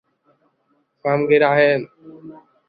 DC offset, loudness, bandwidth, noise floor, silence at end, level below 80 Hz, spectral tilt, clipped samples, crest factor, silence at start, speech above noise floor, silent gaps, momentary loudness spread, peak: under 0.1%; -17 LUFS; 5 kHz; -66 dBFS; 0.35 s; -68 dBFS; -10.5 dB/octave; under 0.1%; 18 dB; 1.05 s; 49 dB; none; 21 LU; -2 dBFS